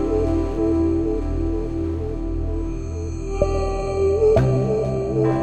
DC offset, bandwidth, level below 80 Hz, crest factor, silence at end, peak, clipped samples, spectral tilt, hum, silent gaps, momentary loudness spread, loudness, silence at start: 0.5%; 8.6 kHz; -28 dBFS; 16 dB; 0 s; -4 dBFS; under 0.1%; -8.5 dB/octave; none; none; 10 LU; -22 LUFS; 0 s